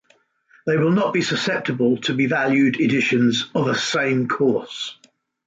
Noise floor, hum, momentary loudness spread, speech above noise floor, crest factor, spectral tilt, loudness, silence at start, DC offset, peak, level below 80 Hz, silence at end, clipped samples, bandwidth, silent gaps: -60 dBFS; none; 6 LU; 40 dB; 14 dB; -5 dB/octave; -20 LUFS; 0.65 s; under 0.1%; -8 dBFS; -64 dBFS; 0.55 s; under 0.1%; 8.6 kHz; none